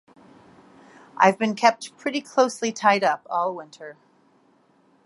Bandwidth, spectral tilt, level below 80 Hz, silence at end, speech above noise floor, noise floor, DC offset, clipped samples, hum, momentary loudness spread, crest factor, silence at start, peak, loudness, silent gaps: 11.5 kHz; -4 dB/octave; -78 dBFS; 1.15 s; 38 dB; -61 dBFS; under 0.1%; under 0.1%; none; 18 LU; 22 dB; 1.15 s; -2 dBFS; -22 LUFS; none